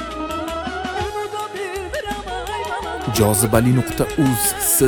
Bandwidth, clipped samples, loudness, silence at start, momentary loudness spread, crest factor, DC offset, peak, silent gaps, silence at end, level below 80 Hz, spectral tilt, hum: 19.5 kHz; under 0.1%; -20 LUFS; 0 s; 11 LU; 20 dB; under 0.1%; 0 dBFS; none; 0 s; -38 dBFS; -4.5 dB/octave; none